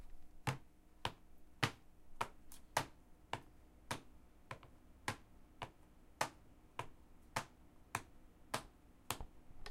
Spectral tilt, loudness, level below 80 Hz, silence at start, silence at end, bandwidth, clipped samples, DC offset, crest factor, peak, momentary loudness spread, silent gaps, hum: -3.5 dB/octave; -47 LUFS; -62 dBFS; 0 s; 0 s; 16.5 kHz; under 0.1%; under 0.1%; 34 dB; -14 dBFS; 24 LU; none; none